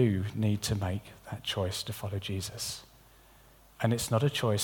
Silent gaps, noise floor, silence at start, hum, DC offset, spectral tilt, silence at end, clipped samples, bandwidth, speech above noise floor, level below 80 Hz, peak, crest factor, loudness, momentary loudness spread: none; -58 dBFS; 0 s; none; under 0.1%; -5 dB/octave; 0 s; under 0.1%; 19 kHz; 27 dB; -56 dBFS; -12 dBFS; 20 dB; -32 LUFS; 9 LU